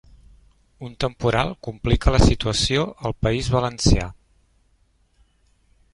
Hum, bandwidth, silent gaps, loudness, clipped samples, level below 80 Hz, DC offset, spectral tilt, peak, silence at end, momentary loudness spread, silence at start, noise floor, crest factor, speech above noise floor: none; 11.5 kHz; none; -21 LUFS; under 0.1%; -28 dBFS; under 0.1%; -5 dB/octave; -2 dBFS; 1.8 s; 10 LU; 0.8 s; -62 dBFS; 20 dB; 42 dB